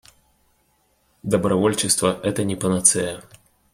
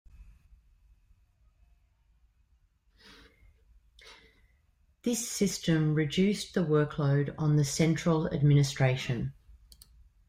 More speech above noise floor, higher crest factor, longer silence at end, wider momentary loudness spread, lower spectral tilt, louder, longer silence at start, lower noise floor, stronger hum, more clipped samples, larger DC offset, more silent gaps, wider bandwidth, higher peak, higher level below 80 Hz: about the same, 44 dB vs 41 dB; about the same, 22 dB vs 18 dB; second, 0.5 s vs 0.75 s; first, 12 LU vs 8 LU; second, -3.5 dB/octave vs -6 dB/octave; first, -20 LUFS vs -28 LUFS; first, 1.25 s vs 0.2 s; second, -64 dBFS vs -68 dBFS; neither; neither; neither; neither; about the same, 16 kHz vs 16 kHz; first, 0 dBFS vs -14 dBFS; about the same, -54 dBFS vs -56 dBFS